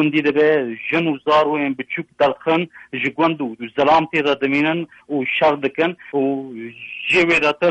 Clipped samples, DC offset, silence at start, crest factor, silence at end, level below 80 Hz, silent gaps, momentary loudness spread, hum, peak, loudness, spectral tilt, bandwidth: under 0.1%; under 0.1%; 0 s; 14 dB; 0 s; -58 dBFS; none; 10 LU; none; -4 dBFS; -18 LUFS; -6 dB/octave; 8.8 kHz